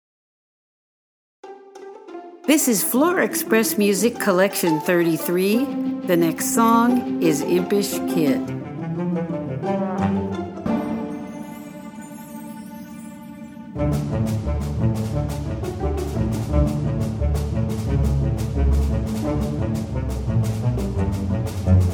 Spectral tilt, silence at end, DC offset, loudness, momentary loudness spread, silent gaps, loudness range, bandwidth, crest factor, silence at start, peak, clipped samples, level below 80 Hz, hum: -6 dB/octave; 0 s; under 0.1%; -21 LUFS; 18 LU; none; 9 LU; over 20 kHz; 18 dB; 1.45 s; -4 dBFS; under 0.1%; -32 dBFS; none